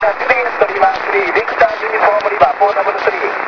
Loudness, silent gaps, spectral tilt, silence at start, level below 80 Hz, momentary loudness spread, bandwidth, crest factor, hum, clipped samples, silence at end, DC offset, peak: -13 LUFS; none; -4.5 dB/octave; 0 s; -50 dBFS; 3 LU; 5.4 kHz; 14 dB; none; 0.2%; 0 s; under 0.1%; 0 dBFS